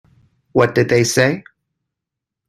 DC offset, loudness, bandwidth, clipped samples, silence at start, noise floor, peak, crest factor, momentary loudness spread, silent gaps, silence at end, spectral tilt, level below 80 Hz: under 0.1%; -16 LUFS; 14 kHz; under 0.1%; 0.55 s; -83 dBFS; 0 dBFS; 18 dB; 7 LU; none; 1.1 s; -5 dB/octave; -54 dBFS